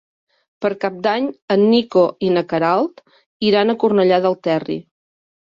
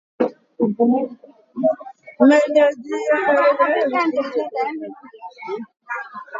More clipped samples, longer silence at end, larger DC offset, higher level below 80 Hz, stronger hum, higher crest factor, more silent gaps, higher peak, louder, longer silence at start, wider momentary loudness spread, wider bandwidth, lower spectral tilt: neither; first, 0.7 s vs 0 s; neither; first, -62 dBFS vs -74 dBFS; neither; about the same, 16 dB vs 18 dB; first, 1.42-1.48 s, 3.26-3.40 s vs none; about the same, -2 dBFS vs 0 dBFS; about the same, -17 LUFS vs -19 LUFS; first, 0.6 s vs 0.2 s; second, 9 LU vs 18 LU; about the same, 7.2 kHz vs 7.8 kHz; first, -7.5 dB/octave vs -5.5 dB/octave